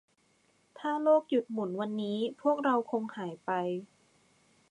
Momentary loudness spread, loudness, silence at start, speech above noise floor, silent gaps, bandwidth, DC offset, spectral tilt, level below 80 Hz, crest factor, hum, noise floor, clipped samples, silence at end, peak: 12 LU; -31 LUFS; 0.75 s; 39 dB; none; 10.5 kHz; under 0.1%; -7 dB/octave; -86 dBFS; 18 dB; none; -70 dBFS; under 0.1%; 0.85 s; -14 dBFS